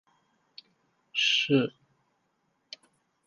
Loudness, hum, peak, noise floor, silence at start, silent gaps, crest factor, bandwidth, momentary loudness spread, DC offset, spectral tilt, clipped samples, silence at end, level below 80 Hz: -26 LUFS; none; -12 dBFS; -75 dBFS; 1.15 s; none; 22 dB; 10 kHz; 24 LU; under 0.1%; -4 dB/octave; under 0.1%; 1.6 s; -80 dBFS